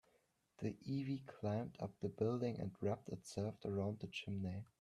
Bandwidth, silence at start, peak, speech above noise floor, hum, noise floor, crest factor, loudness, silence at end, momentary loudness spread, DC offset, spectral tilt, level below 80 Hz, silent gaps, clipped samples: 12.5 kHz; 0.6 s; -26 dBFS; 36 dB; none; -79 dBFS; 18 dB; -44 LUFS; 0.2 s; 7 LU; under 0.1%; -7 dB/octave; -74 dBFS; none; under 0.1%